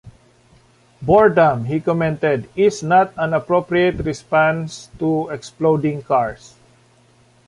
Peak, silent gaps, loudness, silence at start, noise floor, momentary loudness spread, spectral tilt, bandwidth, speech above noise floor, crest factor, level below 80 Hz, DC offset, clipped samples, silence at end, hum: -2 dBFS; none; -18 LUFS; 0.05 s; -53 dBFS; 11 LU; -6.5 dB/octave; 11.5 kHz; 36 dB; 16 dB; -48 dBFS; under 0.1%; under 0.1%; 1.1 s; none